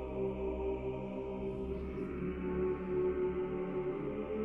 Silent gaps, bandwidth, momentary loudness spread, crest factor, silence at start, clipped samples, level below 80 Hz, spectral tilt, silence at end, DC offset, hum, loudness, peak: none; 3.7 kHz; 5 LU; 12 dB; 0 s; under 0.1%; -50 dBFS; -10 dB/octave; 0 s; under 0.1%; none; -38 LUFS; -24 dBFS